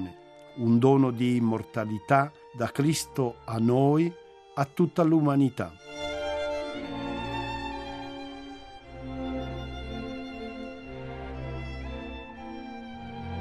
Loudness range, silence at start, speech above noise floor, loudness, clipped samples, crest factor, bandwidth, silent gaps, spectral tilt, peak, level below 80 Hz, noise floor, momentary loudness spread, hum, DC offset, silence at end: 12 LU; 0 s; 23 dB; -28 LUFS; under 0.1%; 22 dB; 13.5 kHz; none; -6.5 dB/octave; -6 dBFS; -48 dBFS; -48 dBFS; 18 LU; none; under 0.1%; 0 s